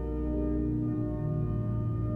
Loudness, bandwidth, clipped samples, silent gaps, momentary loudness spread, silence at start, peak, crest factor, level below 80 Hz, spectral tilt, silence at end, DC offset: -31 LUFS; 3.2 kHz; under 0.1%; none; 2 LU; 0 s; -20 dBFS; 10 dB; -38 dBFS; -12 dB/octave; 0 s; under 0.1%